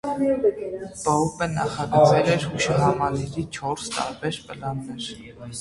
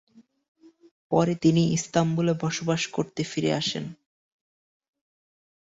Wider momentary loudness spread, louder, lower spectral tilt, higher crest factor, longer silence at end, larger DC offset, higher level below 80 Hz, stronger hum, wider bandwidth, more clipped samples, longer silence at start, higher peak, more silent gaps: first, 15 LU vs 8 LU; about the same, -23 LUFS vs -25 LUFS; about the same, -5.5 dB/octave vs -5.5 dB/octave; about the same, 20 dB vs 20 dB; second, 0 s vs 1.7 s; neither; first, -50 dBFS vs -62 dBFS; neither; first, 11.5 kHz vs 8 kHz; neither; second, 0.05 s vs 1.1 s; first, -4 dBFS vs -8 dBFS; neither